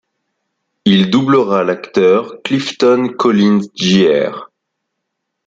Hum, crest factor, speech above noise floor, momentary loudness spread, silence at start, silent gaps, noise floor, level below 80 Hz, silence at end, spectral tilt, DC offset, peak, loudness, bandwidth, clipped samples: none; 14 dB; 62 dB; 7 LU; 0.85 s; none; -74 dBFS; -56 dBFS; 1 s; -6 dB/octave; under 0.1%; 0 dBFS; -13 LUFS; 7.8 kHz; under 0.1%